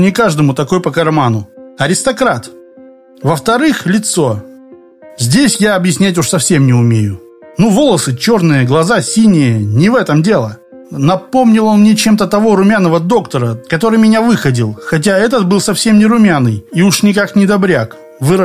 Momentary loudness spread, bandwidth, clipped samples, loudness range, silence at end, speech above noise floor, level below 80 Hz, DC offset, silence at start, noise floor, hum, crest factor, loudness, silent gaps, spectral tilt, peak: 7 LU; 15.5 kHz; under 0.1%; 4 LU; 0 s; 28 dB; -44 dBFS; under 0.1%; 0 s; -38 dBFS; none; 10 dB; -11 LUFS; none; -5.5 dB/octave; 0 dBFS